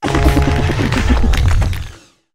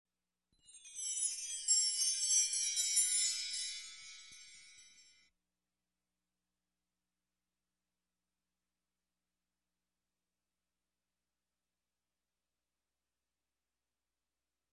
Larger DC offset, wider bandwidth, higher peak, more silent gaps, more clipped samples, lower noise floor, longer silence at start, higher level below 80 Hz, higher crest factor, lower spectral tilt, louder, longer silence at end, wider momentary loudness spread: neither; first, 15.5 kHz vs 12.5 kHz; first, 0 dBFS vs -20 dBFS; neither; neither; second, -35 dBFS vs under -90 dBFS; second, 0 s vs 0.75 s; first, -16 dBFS vs -86 dBFS; second, 14 dB vs 24 dB; first, -6 dB/octave vs 6 dB/octave; first, -15 LUFS vs -33 LUFS; second, 0.4 s vs 9.9 s; second, 8 LU vs 21 LU